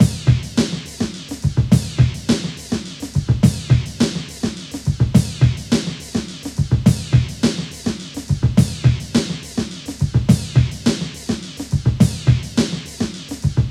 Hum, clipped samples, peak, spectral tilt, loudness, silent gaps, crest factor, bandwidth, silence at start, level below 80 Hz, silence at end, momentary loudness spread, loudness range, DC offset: none; under 0.1%; 0 dBFS; -6 dB/octave; -19 LUFS; none; 18 dB; 14 kHz; 0 s; -34 dBFS; 0 s; 10 LU; 1 LU; under 0.1%